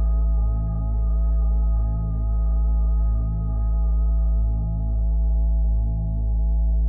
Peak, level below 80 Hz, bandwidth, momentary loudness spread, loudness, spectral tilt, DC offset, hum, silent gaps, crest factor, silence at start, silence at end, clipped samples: -14 dBFS; -20 dBFS; 1.3 kHz; 3 LU; -24 LUFS; -15.5 dB/octave; under 0.1%; none; none; 6 dB; 0 s; 0 s; under 0.1%